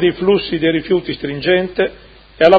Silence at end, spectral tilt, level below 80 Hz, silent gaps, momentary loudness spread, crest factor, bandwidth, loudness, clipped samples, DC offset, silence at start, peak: 0 s; -7.5 dB/octave; -44 dBFS; none; 6 LU; 14 dB; 6 kHz; -17 LUFS; 0.1%; under 0.1%; 0 s; 0 dBFS